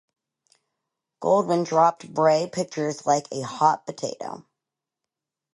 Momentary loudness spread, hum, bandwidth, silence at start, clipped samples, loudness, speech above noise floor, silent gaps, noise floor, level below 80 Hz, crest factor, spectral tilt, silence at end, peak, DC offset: 12 LU; none; 11.5 kHz; 1.2 s; under 0.1%; -23 LUFS; 64 dB; none; -87 dBFS; -74 dBFS; 20 dB; -5 dB/octave; 1.1 s; -6 dBFS; under 0.1%